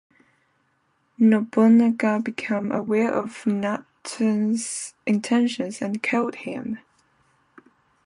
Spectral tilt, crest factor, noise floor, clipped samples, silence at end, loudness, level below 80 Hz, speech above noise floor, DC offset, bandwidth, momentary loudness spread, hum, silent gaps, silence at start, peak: -5.5 dB/octave; 16 dB; -68 dBFS; under 0.1%; 1.3 s; -23 LUFS; -70 dBFS; 46 dB; under 0.1%; 11 kHz; 14 LU; none; none; 1.2 s; -6 dBFS